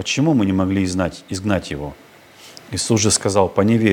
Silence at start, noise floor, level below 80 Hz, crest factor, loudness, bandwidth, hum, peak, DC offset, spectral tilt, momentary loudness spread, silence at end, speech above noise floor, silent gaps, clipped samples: 0 s; -44 dBFS; -48 dBFS; 18 dB; -18 LUFS; 18 kHz; none; 0 dBFS; under 0.1%; -4.5 dB/octave; 12 LU; 0 s; 26 dB; none; under 0.1%